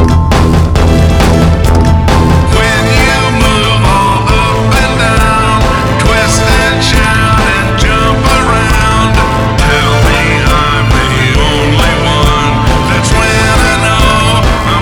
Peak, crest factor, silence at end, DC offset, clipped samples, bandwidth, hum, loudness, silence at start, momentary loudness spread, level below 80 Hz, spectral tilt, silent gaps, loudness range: 0 dBFS; 8 dB; 0 s; under 0.1%; 0.4%; 19.5 kHz; none; -8 LUFS; 0 s; 2 LU; -14 dBFS; -5 dB/octave; none; 1 LU